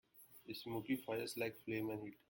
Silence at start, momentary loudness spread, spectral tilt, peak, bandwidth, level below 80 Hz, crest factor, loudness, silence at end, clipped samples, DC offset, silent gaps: 0.15 s; 11 LU; -5 dB/octave; -28 dBFS; 17 kHz; -80 dBFS; 18 dB; -44 LUFS; 0.15 s; under 0.1%; under 0.1%; none